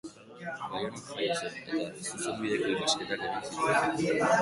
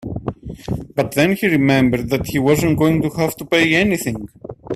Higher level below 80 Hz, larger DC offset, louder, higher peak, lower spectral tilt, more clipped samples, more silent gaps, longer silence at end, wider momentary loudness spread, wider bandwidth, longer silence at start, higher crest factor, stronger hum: second, -68 dBFS vs -40 dBFS; neither; second, -31 LUFS vs -17 LUFS; second, -12 dBFS vs 0 dBFS; second, -3.5 dB/octave vs -5.5 dB/octave; neither; neither; about the same, 0 s vs 0 s; second, 10 LU vs 14 LU; second, 11.5 kHz vs 16 kHz; about the same, 0.05 s vs 0 s; about the same, 18 dB vs 16 dB; neither